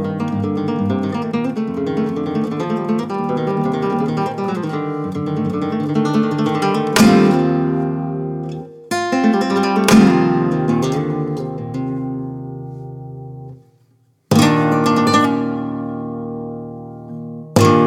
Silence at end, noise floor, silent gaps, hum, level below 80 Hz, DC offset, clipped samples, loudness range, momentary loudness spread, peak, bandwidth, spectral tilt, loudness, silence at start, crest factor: 0 s; -57 dBFS; none; none; -50 dBFS; under 0.1%; under 0.1%; 5 LU; 18 LU; -2 dBFS; 17 kHz; -6 dB/octave; -17 LUFS; 0 s; 16 dB